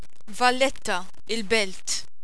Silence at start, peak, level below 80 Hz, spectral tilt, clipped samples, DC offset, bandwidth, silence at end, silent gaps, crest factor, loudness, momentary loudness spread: 0.3 s; -8 dBFS; -52 dBFS; -2 dB/octave; under 0.1%; 4%; 11 kHz; 0.2 s; none; 20 dB; -25 LUFS; 10 LU